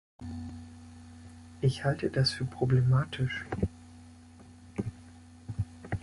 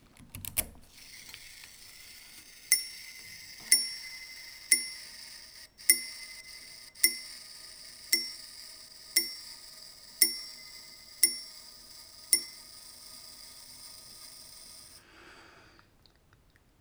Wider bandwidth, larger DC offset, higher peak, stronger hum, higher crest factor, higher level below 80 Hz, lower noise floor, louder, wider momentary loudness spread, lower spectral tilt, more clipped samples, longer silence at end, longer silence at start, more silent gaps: second, 11.5 kHz vs over 20 kHz; neither; second, -14 dBFS vs -4 dBFS; neither; second, 18 dB vs 32 dB; first, -50 dBFS vs -64 dBFS; second, -52 dBFS vs -64 dBFS; second, -31 LUFS vs -28 LUFS; about the same, 23 LU vs 22 LU; first, -6.5 dB/octave vs 1.5 dB/octave; neither; second, 0 s vs 1.1 s; about the same, 0.2 s vs 0.2 s; neither